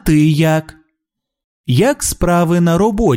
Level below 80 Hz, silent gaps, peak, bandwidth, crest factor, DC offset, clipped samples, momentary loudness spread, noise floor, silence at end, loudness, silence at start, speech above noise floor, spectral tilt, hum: -32 dBFS; 1.44-1.64 s; 0 dBFS; 16.5 kHz; 14 dB; under 0.1%; under 0.1%; 6 LU; -78 dBFS; 0 s; -14 LUFS; 0.05 s; 65 dB; -6 dB/octave; none